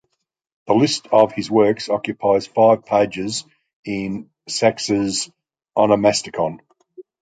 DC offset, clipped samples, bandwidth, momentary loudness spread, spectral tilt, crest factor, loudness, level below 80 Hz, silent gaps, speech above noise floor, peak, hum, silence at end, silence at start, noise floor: under 0.1%; under 0.1%; 9.4 kHz; 12 LU; -4.5 dB/octave; 18 dB; -19 LUFS; -56 dBFS; 3.73-3.83 s; 57 dB; -2 dBFS; none; 0.2 s; 0.65 s; -75 dBFS